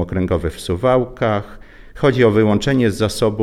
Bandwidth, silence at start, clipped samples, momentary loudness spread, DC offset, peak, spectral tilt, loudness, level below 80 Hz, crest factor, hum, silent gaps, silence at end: 15.5 kHz; 0 s; under 0.1%; 7 LU; under 0.1%; -2 dBFS; -6.5 dB/octave; -17 LUFS; -36 dBFS; 16 dB; none; none; 0 s